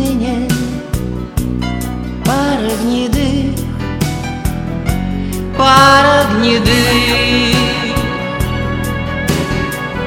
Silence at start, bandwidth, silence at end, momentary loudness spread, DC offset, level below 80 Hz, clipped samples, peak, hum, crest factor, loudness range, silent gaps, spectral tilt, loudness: 0 s; 18.5 kHz; 0 s; 11 LU; under 0.1%; -26 dBFS; 0.2%; 0 dBFS; none; 14 dB; 6 LU; none; -5 dB/octave; -14 LUFS